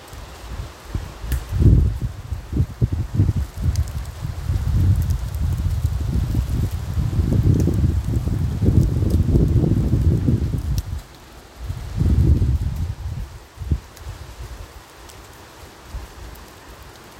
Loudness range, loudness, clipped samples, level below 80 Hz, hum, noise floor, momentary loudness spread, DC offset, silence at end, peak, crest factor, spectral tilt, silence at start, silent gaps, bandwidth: 13 LU; -21 LUFS; under 0.1%; -26 dBFS; none; -42 dBFS; 22 LU; under 0.1%; 0 s; -2 dBFS; 20 dB; -8 dB/octave; 0 s; none; 16.5 kHz